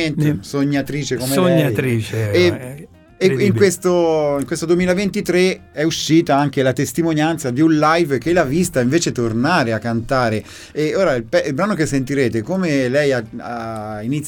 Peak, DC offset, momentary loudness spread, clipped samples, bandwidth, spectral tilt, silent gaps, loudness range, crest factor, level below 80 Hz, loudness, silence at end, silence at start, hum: -2 dBFS; under 0.1%; 8 LU; under 0.1%; 18 kHz; -5.5 dB/octave; none; 2 LU; 16 dB; -46 dBFS; -17 LUFS; 0 s; 0 s; none